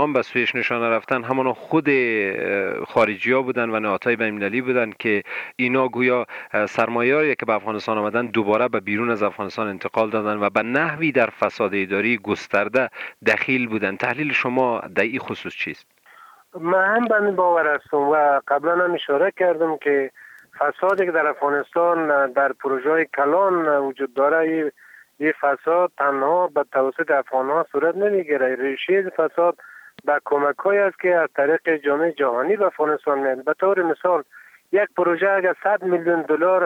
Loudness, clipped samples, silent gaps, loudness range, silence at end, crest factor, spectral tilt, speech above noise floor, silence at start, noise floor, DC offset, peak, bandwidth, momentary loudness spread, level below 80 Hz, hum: -21 LUFS; under 0.1%; none; 2 LU; 0 s; 14 dB; -6.5 dB/octave; 28 dB; 0 s; -49 dBFS; under 0.1%; -6 dBFS; 9.6 kHz; 5 LU; -70 dBFS; none